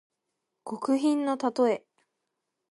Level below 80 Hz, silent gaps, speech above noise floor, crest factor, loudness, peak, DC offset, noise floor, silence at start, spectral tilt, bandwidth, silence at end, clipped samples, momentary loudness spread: -84 dBFS; none; 56 dB; 16 dB; -27 LUFS; -12 dBFS; under 0.1%; -83 dBFS; 0.65 s; -5 dB/octave; 11.5 kHz; 0.95 s; under 0.1%; 13 LU